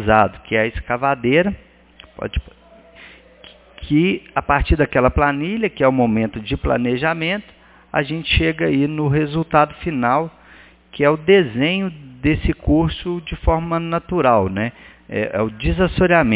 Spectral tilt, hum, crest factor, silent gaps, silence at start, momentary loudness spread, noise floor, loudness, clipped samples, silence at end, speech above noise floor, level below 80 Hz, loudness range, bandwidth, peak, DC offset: -10.5 dB/octave; none; 18 dB; none; 0 s; 10 LU; -46 dBFS; -18 LUFS; under 0.1%; 0 s; 29 dB; -32 dBFS; 4 LU; 4 kHz; 0 dBFS; under 0.1%